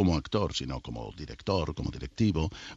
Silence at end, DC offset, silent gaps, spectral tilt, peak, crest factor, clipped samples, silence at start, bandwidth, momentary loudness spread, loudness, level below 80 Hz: 0 s; under 0.1%; none; -6.5 dB/octave; -12 dBFS; 18 dB; under 0.1%; 0 s; 8 kHz; 11 LU; -32 LUFS; -42 dBFS